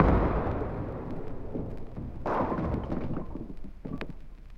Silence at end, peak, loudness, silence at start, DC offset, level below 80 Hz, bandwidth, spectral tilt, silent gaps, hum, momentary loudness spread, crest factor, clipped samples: 0 s; -6 dBFS; -33 LUFS; 0 s; under 0.1%; -36 dBFS; 6 kHz; -9.5 dB/octave; none; none; 13 LU; 26 dB; under 0.1%